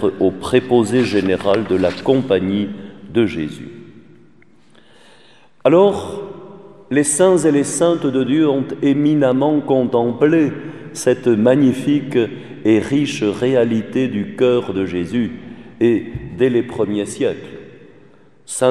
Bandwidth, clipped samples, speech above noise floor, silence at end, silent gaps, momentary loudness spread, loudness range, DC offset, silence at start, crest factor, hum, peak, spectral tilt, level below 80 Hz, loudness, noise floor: 13 kHz; under 0.1%; 35 dB; 0 s; none; 14 LU; 5 LU; 0.4%; 0 s; 18 dB; none; 0 dBFS; -5.5 dB/octave; -52 dBFS; -17 LUFS; -51 dBFS